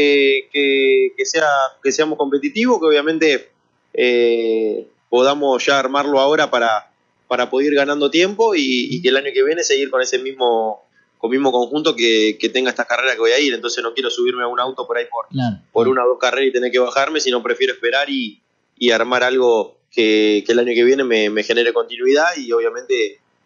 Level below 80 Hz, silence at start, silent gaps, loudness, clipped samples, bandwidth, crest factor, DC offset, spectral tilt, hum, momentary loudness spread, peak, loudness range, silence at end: -74 dBFS; 0 s; none; -17 LUFS; under 0.1%; 7.4 kHz; 14 dB; under 0.1%; -3 dB/octave; none; 7 LU; -2 dBFS; 2 LU; 0.35 s